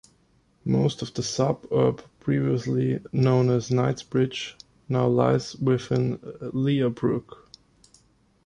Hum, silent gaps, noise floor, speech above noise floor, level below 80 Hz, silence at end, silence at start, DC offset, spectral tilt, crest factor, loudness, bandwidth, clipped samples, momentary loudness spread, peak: none; none; -63 dBFS; 39 dB; -56 dBFS; 1.25 s; 0.65 s; under 0.1%; -7 dB/octave; 18 dB; -25 LUFS; 10 kHz; under 0.1%; 9 LU; -6 dBFS